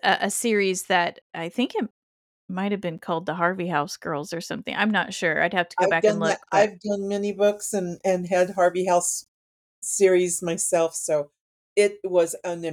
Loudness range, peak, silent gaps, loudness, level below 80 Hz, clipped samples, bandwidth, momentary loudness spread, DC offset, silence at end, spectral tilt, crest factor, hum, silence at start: 4 LU; -6 dBFS; 1.22-1.30 s, 1.91-2.48 s, 9.28-9.82 s, 11.40-11.76 s; -24 LUFS; -70 dBFS; under 0.1%; 18.5 kHz; 10 LU; under 0.1%; 0 s; -3.5 dB/octave; 18 dB; none; 0.05 s